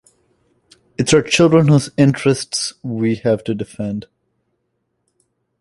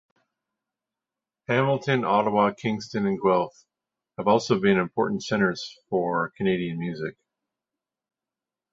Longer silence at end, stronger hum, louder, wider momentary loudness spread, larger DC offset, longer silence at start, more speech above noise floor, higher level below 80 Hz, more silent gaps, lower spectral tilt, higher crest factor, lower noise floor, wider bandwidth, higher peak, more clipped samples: about the same, 1.6 s vs 1.6 s; neither; first, -16 LUFS vs -25 LUFS; about the same, 13 LU vs 11 LU; neither; second, 1 s vs 1.5 s; second, 55 dB vs 65 dB; first, -52 dBFS vs -64 dBFS; neither; about the same, -5.5 dB/octave vs -6 dB/octave; about the same, 16 dB vs 20 dB; second, -71 dBFS vs -89 dBFS; first, 11.5 kHz vs 7.8 kHz; first, -2 dBFS vs -6 dBFS; neither